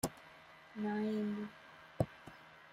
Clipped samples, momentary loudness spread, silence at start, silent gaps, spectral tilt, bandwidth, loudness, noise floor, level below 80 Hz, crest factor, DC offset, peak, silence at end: under 0.1%; 20 LU; 0.05 s; none; -6 dB/octave; 15.5 kHz; -40 LUFS; -59 dBFS; -66 dBFS; 24 dB; under 0.1%; -18 dBFS; 0 s